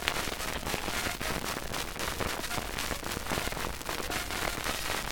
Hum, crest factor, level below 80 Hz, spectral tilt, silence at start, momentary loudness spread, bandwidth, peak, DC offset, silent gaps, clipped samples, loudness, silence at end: none; 30 dB; -44 dBFS; -2.5 dB/octave; 0 s; 3 LU; 19 kHz; -4 dBFS; under 0.1%; none; under 0.1%; -33 LUFS; 0 s